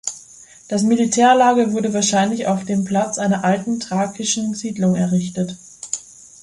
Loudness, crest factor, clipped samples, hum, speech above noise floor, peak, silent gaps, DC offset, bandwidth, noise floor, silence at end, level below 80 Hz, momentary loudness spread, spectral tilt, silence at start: -18 LUFS; 16 dB; under 0.1%; none; 26 dB; -2 dBFS; none; under 0.1%; 11.5 kHz; -44 dBFS; 0.4 s; -58 dBFS; 14 LU; -4.5 dB/octave; 0.05 s